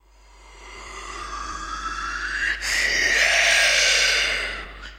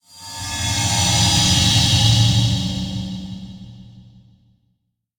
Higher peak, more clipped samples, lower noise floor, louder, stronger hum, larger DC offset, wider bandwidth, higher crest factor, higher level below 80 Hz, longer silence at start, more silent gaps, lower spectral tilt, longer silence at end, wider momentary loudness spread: second, -6 dBFS vs -2 dBFS; neither; second, -50 dBFS vs -70 dBFS; second, -19 LUFS vs -16 LUFS; neither; neither; second, 16 kHz vs 19.5 kHz; about the same, 18 dB vs 16 dB; second, -42 dBFS vs -36 dBFS; first, 0.4 s vs 0.15 s; neither; second, 0.5 dB/octave vs -3 dB/octave; second, 0 s vs 1.15 s; about the same, 18 LU vs 19 LU